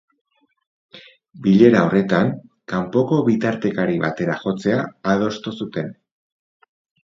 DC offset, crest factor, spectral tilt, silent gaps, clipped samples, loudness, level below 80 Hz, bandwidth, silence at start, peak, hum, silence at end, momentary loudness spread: under 0.1%; 20 dB; -7.5 dB/octave; none; under 0.1%; -19 LUFS; -58 dBFS; 7.6 kHz; 0.95 s; 0 dBFS; none; 1.1 s; 14 LU